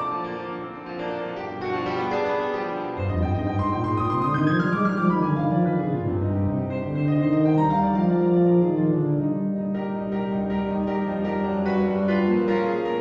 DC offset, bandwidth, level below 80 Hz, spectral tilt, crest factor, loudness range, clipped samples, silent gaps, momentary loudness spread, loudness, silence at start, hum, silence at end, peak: under 0.1%; 6.4 kHz; -48 dBFS; -9.5 dB/octave; 14 dB; 5 LU; under 0.1%; none; 9 LU; -24 LUFS; 0 s; none; 0 s; -10 dBFS